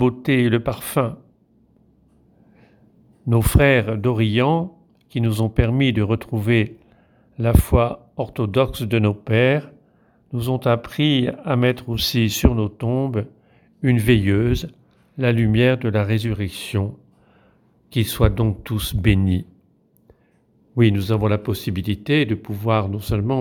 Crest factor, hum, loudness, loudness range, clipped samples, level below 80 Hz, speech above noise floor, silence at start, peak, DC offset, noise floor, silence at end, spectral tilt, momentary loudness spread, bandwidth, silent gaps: 20 dB; none; -20 LUFS; 3 LU; under 0.1%; -32 dBFS; 41 dB; 0 s; 0 dBFS; under 0.1%; -59 dBFS; 0 s; -6.5 dB/octave; 9 LU; 19.5 kHz; none